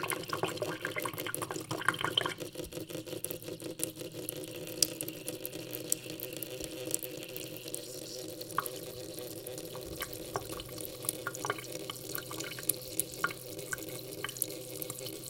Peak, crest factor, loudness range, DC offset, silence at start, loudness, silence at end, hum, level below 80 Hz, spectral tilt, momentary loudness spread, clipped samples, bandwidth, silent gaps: -2 dBFS; 36 dB; 4 LU; under 0.1%; 0 s; -37 LUFS; 0 s; none; -64 dBFS; -2.5 dB/octave; 9 LU; under 0.1%; 17 kHz; none